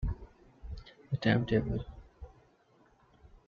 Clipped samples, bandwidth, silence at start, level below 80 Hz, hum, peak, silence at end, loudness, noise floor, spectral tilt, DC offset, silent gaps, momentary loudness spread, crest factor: under 0.1%; 7.2 kHz; 0 s; -46 dBFS; none; -14 dBFS; 0.1 s; -32 LUFS; -66 dBFS; -8.5 dB/octave; under 0.1%; none; 25 LU; 22 dB